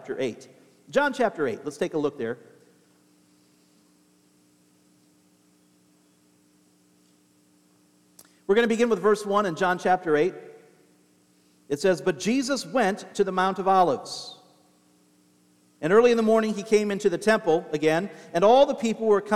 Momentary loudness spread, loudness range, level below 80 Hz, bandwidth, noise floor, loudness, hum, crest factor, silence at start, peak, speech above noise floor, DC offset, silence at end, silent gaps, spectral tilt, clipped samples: 13 LU; 9 LU; -66 dBFS; 14 kHz; -62 dBFS; -24 LUFS; none; 20 dB; 0 s; -6 dBFS; 39 dB; under 0.1%; 0 s; none; -5 dB/octave; under 0.1%